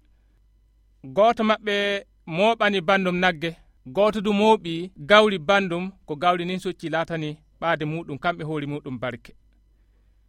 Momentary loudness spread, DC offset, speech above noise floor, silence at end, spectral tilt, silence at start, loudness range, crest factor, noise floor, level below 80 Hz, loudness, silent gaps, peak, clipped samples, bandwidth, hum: 12 LU; under 0.1%; 36 dB; 1.1 s; -5.5 dB/octave; 1.05 s; 8 LU; 24 dB; -59 dBFS; -56 dBFS; -23 LUFS; none; 0 dBFS; under 0.1%; 12.5 kHz; none